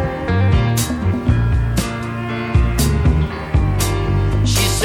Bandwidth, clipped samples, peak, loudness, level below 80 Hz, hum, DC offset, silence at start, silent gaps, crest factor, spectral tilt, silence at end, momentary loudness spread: 17.5 kHz; under 0.1%; -2 dBFS; -17 LUFS; -22 dBFS; none; under 0.1%; 0 s; none; 14 dB; -5.5 dB/octave; 0 s; 5 LU